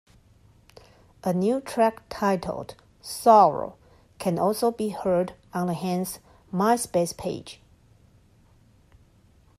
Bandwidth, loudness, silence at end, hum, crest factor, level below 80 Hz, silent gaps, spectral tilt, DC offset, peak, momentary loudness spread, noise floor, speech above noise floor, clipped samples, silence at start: 15 kHz; -24 LUFS; 2.05 s; none; 22 dB; -58 dBFS; none; -5.5 dB/octave; under 0.1%; -4 dBFS; 18 LU; -58 dBFS; 34 dB; under 0.1%; 1.25 s